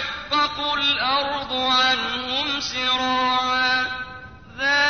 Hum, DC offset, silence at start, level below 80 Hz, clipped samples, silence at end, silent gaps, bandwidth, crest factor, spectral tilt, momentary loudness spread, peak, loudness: none; 0.2%; 0 s; -52 dBFS; under 0.1%; 0 s; none; 6.6 kHz; 14 dB; -2 dB/octave; 8 LU; -8 dBFS; -20 LUFS